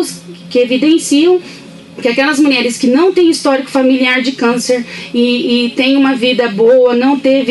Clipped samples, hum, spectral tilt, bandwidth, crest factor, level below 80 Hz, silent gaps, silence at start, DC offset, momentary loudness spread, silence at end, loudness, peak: under 0.1%; none; -3.5 dB/octave; 12 kHz; 10 dB; -60 dBFS; none; 0 s; under 0.1%; 7 LU; 0 s; -11 LUFS; -2 dBFS